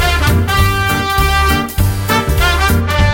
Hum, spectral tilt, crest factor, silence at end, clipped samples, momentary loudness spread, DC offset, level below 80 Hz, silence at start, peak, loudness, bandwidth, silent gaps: none; -4.5 dB/octave; 12 dB; 0 s; under 0.1%; 3 LU; under 0.1%; -18 dBFS; 0 s; 0 dBFS; -13 LUFS; 17 kHz; none